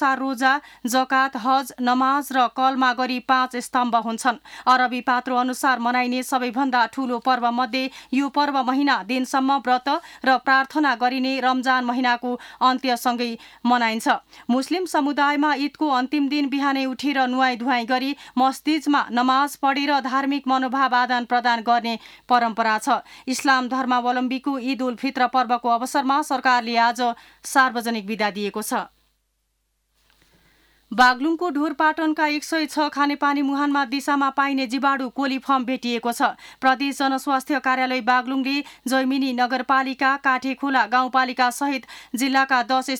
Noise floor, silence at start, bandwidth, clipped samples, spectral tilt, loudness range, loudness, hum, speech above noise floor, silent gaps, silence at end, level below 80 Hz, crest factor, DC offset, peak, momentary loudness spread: -72 dBFS; 0 s; 17.5 kHz; under 0.1%; -2.5 dB/octave; 2 LU; -21 LUFS; none; 50 dB; none; 0 s; -68 dBFS; 16 dB; under 0.1%; -6 dBFS; 6 LU